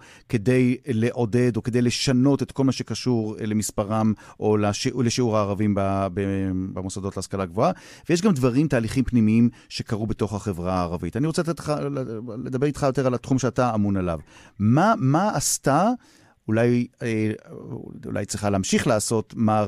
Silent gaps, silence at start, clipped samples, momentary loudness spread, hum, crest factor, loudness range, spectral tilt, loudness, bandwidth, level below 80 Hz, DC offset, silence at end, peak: none; 0.3 s; under 0.1%; 10 LU; none; 18 dB; 3 LU; -6 dB/octave; -23 LUFS; 15 kHz; -48 dBFS; under 0.1%; 0 s; -4 dBFS